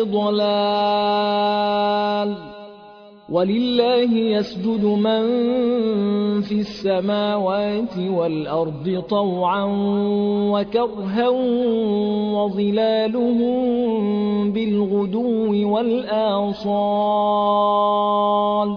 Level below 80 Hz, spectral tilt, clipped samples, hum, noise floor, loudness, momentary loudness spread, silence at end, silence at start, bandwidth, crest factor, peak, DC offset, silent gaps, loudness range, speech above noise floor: -56 dBFS; -8 dB/octave; under 0.1%; none; -43 dBFS; -20 LUFS; 4 LU; 0 s; 0 s; 5.4 kHz; 14 dB; -6 dBFS; under 0.1%; none; 2 LU; 24 dB